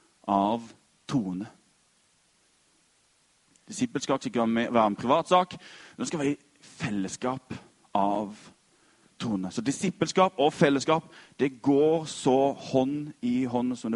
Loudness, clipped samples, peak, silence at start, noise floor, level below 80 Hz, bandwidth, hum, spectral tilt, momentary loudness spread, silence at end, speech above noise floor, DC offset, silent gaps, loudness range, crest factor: -27 LUFS; under 0.1%; -6 dBFS; 0.25 s; -66 dBFS; -66 dBFS; 11.5 kHz; none; -5.5 dB/octave; 14 LU; 0 s; 40 dB; under 0.1%; none; 9 LU; 22 dB